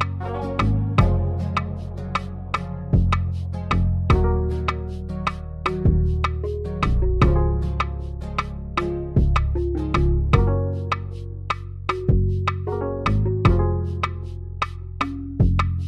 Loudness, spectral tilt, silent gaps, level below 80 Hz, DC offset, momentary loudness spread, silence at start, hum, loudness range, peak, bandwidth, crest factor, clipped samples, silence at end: -23 LUFS; -8 dB/octave; none; -26 dBFS; under 0.1%; 9 LU; 0 s; none; 1 LU; -2 dBFS; 8.8 kHz; 20 dB; under 0.1%; 0 s